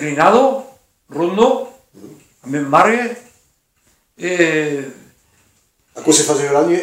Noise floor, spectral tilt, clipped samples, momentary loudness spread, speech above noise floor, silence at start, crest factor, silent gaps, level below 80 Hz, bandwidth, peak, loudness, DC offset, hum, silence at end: -60 dBFS; -3.5 dB/octave; under 0.1%; 14 LU; 46 dB; 0 s; 18 dB; none; -60 dBFS; 16 kHz; 0 dBFS; -15 LUFS; under 0.1%; none; 0 s